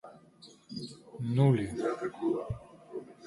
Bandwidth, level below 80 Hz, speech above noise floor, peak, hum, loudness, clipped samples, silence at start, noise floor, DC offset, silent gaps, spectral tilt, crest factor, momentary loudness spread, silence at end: 11.5 kHz; -60 dBFS; 28 dB; -14 dBFS; none; -32 LUFS; under 0.1%; 0.05 s; -57 dBFS; under 0.1%; none; -8 dB/octave; 20 dB; 19 LU; 0 s